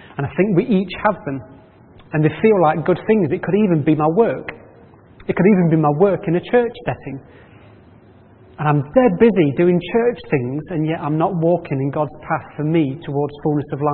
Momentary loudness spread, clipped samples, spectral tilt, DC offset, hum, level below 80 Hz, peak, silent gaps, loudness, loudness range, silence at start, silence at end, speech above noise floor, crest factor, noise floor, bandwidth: 11 LU; under 0.1%; -13 dB/octave; under 0.1%; none; -52 dBFS; -2 dBFS; none; -18 LUFS; 3 LU; 0.05 s; 0 s; 29 dB; 16 dB; -46 dBFS; 4.3 kHz